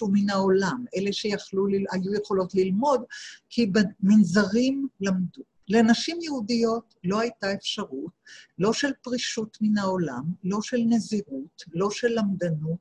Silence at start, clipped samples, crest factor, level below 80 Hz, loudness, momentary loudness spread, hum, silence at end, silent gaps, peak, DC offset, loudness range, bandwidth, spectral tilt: 0 s; under 0.1%; 16 dB; -62 dBFS; -25 LUFS; 10 LU; none; 0.05 s; none; -8 dBFS; under 0.1%; 4 LU; 9.6 kHz; -5.5 dB/octave